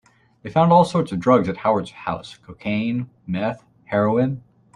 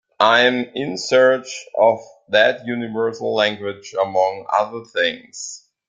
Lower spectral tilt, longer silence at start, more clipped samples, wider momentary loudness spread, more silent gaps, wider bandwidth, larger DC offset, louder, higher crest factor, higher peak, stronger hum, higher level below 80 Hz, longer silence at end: first, -7.5 dB/octave vs -3 dB/octave; first, 0.45 s vs 0.2 s; neither; first, 16 LU vs 13 LU; neither; first, 11 kHz vs 9.2 kHz; neither; about the same, -21 LUFS vs -19 LUFS; about the same, 18 dB vs 18 dB; about the same, -2 dBFS vs -2 dBFS; neither; first, -56 dBFS vs -68 dBFS; about the same, 0.35 s vs 0.3 s